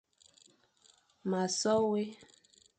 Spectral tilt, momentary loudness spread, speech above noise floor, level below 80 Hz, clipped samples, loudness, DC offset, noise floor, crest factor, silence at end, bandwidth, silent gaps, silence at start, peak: -4.5 dB/octave; 12 LU; 36 dB; -74 dBFS; under 0.1%; -32 LUFS; under 0.1%; -67 dBFS; 18 dB; 0.55 s; 9 kHz; none; 1.25 s; -18 dBFS